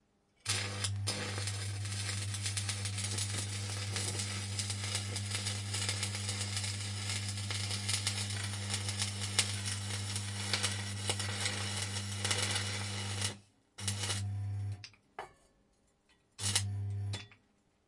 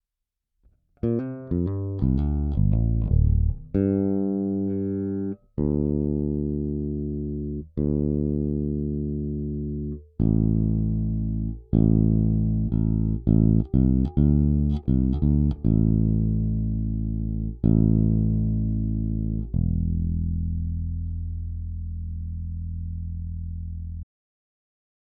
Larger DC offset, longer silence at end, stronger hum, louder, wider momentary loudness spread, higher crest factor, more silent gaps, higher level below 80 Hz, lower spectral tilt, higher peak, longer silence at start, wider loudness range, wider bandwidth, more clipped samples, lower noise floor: neither; second, 0.55 s vs 1 s; neither; second, -36 LUFS vs -25 LUFS; second, 7 LU vs 12 LU; first, 26 dB vs 18 dB; neither; second, -68 dBFS vs -30 dBFS; second, -2.5 dB/octave vs -13.5 dB/octave; second, -12 dBFS vs -6 dBFS; second, 0.45 s vs 1.05 s; second, 5 LU vs 8 LU; first, 11.5 kHz vs 3.4 kHz; neither; second, -72 dBFS vs -84 dBFS